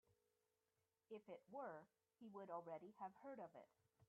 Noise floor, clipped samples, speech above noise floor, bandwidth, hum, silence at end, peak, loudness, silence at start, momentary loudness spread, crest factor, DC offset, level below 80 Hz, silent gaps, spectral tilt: under -90 dBFS; under 0.1%; over 33 dB; 4.2 kHz; none; 0.05 s; -40 dBFS; -58 LUFS; 0.1 s; 8 LU; 20 dB; under 0.1%; under -90 dBFS; none; -5.5 dB/octave